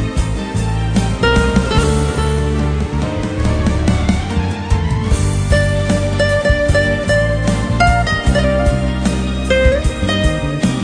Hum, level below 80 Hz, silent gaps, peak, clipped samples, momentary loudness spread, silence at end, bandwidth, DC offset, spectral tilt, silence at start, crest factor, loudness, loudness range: none; -20 dBFS; none; 0 dBFS; under 0.1%; 5 LU; 0 s; 10 kHz; under 0.1%; -6 dB/octave; 0 s; 14 dB; -15 LUFS; 2 LU